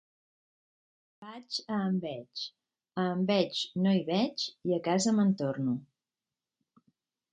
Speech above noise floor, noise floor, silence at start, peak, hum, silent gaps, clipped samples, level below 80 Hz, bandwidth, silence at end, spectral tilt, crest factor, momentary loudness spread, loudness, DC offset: over 60 dB; under -90 dBFS; 1.2 s; -14 dBFS; none; none; under 0.1%; -76 dBFS; 9.4 kHz; 1.5 s; -5.5 dB/octave; 18 dB; 12 LU; -31 LUFS; under 0.1%